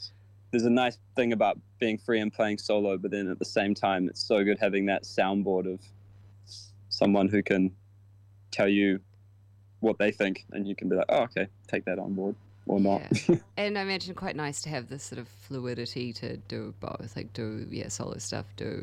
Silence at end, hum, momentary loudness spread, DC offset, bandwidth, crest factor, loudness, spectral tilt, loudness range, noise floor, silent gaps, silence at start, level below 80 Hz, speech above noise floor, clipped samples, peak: 0 s; none; 13 LU; under 0.1%; 12 kHz; 20 dB; -29 LUFS; -5.5 dB/octave; 8 LU; -56 dBFS; none; 0 s; -64 dBFS; 28 dB; under 0.1%; -10 dBFS